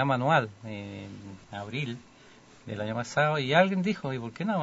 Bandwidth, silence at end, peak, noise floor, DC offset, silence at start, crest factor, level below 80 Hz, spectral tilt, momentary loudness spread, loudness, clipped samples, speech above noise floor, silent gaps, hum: 8 kHz; 0 s; -8 dBFS; -54 dBFS; under 0.1%; 0 s; 20 dB; -66 dBFS; -6 dB/octave; 19 LU; -28 LUFS; under 0.1%; 26 dB; none; none